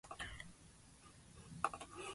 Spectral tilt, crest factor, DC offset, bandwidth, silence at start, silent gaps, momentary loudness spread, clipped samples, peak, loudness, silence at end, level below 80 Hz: -3 dB/octave; 30 dB; under 0.1%; 11.5 kHz; 0.05 s; none; 18 LU; under 0.1%; -20 dBFS; -47 LUFS; 0 s; -66 dBFS